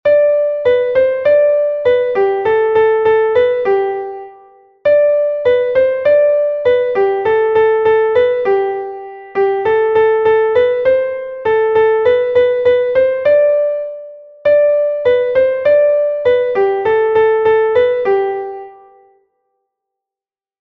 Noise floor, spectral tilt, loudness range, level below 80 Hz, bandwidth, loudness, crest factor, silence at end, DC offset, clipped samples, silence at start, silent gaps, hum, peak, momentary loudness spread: under -90 dBFS; -6.5 dB/octave; 2 LU; -52 dBFS; 4.9 kHz; -13 LUFS; 12 dB; 1.9 s; under 0.1%; under 0.1%; 0.05 s; none; none; -2 dBFS; 8 LU